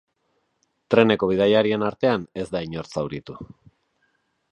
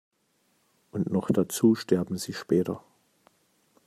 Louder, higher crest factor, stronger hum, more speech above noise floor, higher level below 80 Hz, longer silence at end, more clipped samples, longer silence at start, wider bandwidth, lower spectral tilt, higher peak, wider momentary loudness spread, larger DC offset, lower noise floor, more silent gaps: first, -22 LUFS vs -27 LUFS; about the same, 22 dB vs 20 dB; neither; first, 49 dB vs 45 dB; first, -56 dBFS vs -68 dBFS; about the same, 1.05 s vs 1.1 s; neither; about the same, 0.9 s vs 0.95 s; second, 9.8 kHz vs 14.5 kHz; about the same, -6.5 dB/octave vs -6 dB/octave; first, -2 dBFS vs -8 dBFS; first, 14 LU vs 11 LU; neither; about the same, -71 dBFS vs -71 dBFS; neither